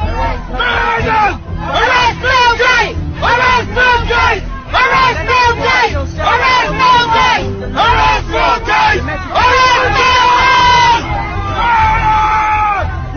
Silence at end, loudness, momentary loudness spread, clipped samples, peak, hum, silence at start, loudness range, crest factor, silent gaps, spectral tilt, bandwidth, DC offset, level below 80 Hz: 0 s; -11 LUFS; 8 LU; under 0.1%; 0 dBFS; none; 0 s; 1 LU; 10 dB; none; -4 dB/octave; 6.8 kHz; under 0.1%; -24 dBFS